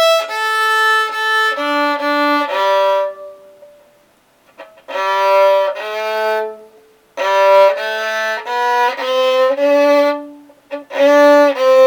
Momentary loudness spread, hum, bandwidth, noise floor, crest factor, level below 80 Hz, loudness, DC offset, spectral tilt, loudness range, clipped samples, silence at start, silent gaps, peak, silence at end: 11 LU; none; 18 kHz; -53 dBFS; 14 dB; -74 dBFS; -14 LUFS; under 0.1%; -1 dB/octave; 5 LU; under 0.1%; 0 s; none; 0 dBFS; 0 s